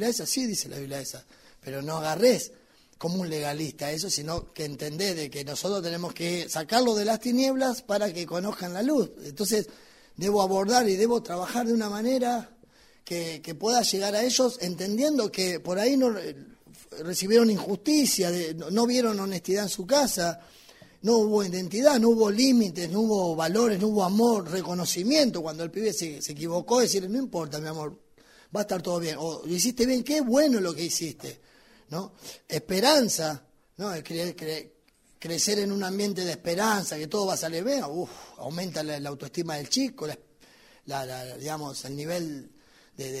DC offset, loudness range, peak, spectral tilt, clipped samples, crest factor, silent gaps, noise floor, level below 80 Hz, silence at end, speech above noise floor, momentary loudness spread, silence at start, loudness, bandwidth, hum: under 0.1%; 6 LU; -6 dBFS; -4 dB/octave; under 0.1%; 20 dB; none; -61 dBFS; -62 dBFS; 0 s; 34 dB; 14 LU; 0 s; -27 LUFS; 16 kHz; none